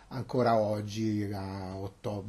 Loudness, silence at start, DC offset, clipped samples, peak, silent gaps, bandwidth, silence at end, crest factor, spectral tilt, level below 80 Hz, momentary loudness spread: -32 LUFS; 0 s; under 0.1%; under 0.1%; -14 dBFS; none; 12.5 kHz; 0 s; 16 dB; -7 dB/octave; -60 dBFS; 12 LU